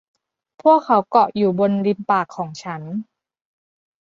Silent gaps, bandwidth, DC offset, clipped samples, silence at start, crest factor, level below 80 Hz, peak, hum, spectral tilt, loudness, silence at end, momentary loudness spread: none; 7.6 kHz; under 0.1%; under 0.1%; 0.65 s; 18 dB; -68 dBFS; -2 dBFS; none; -7.5 dB/octave; -18 LUFS; 1.1 s; 14 LU